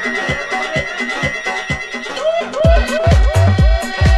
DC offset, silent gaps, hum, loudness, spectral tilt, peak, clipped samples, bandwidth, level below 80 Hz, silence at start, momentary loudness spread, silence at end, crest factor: under 0.1%; none; none; -16 LUFS; -5.5 dB/octave; 0 dBFS; under 0.1%; 13 kHz; -18 dBFS; 0 s; 7 LU; 0 s; 14 dB